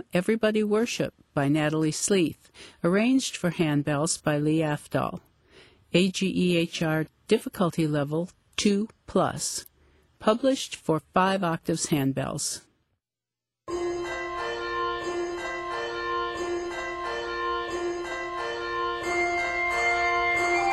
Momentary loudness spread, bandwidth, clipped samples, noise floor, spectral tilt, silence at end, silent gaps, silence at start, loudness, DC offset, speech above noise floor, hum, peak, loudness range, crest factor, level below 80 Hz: 8 LU; 14 kHz; under 0.1%; under -90 dBFS; -4.5 dB/octave; 0 s; none; 0.15 s; -27 LUFS; under 0.1%; over 64 dB; none; -8 dBFS; 5 LU; 18 dB; -56 dBFS